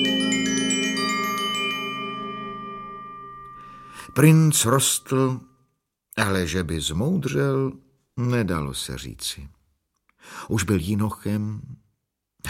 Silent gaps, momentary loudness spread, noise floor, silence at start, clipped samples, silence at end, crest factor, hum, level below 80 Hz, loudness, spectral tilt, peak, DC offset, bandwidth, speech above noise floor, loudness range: none; 20 LU; -76 dBFS; 0 s; under 0.1%; 0 s; 20 dB; none; -48 dBFS; -23 LUFS; -4.5 dB/octave; -4 dBFS; under 0.1%; 16.5 kHz; 54 dB; 7 LU